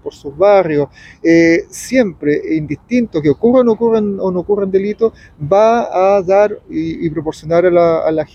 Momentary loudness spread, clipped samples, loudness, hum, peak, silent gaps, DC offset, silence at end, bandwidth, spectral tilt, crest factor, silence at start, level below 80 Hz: 9 LU; under 0.1%; -14 LUFS; none; 0 dBFS; none; under 0.1%; 0.1 s; 14 kHz; -6.5 dB/octave; 12 dB; 0.05 s; -46 dBFS